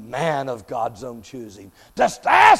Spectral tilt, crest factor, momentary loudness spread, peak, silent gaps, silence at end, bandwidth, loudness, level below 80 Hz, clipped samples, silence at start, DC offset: -3.5 dB/octave; 20 dB; 21 LU; 0 dBFS; none; 0 s; 15.5 kHz; -21 LUFS; -56 dBFS; under 0.1%; 0 s; under 0.1%